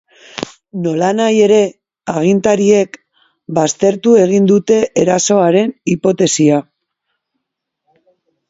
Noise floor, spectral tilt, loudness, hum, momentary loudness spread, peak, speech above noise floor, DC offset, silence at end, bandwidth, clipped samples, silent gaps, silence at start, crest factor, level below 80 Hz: -76 dBFS; -5 dB/octave; -13 LUFS; none; 12 LU; 0 dBFS; 65 dB; under 0.1%; 1.9 s; 8 kHz; under 0.1%; none; 0.35 s; 14 dB; -56 dBFS